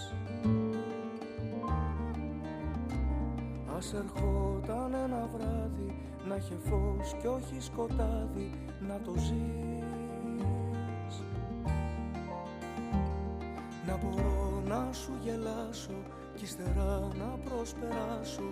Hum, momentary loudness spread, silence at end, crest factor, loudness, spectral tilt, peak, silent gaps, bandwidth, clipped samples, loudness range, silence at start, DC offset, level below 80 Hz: none; 7 LU; 0 s; 14 dB; -37 LUFS; -7 dB/octave; -20 dBFS; none; 15 kHz; under 0.1%; 2 LU; 0 s; under 0.1%; -40 dBFS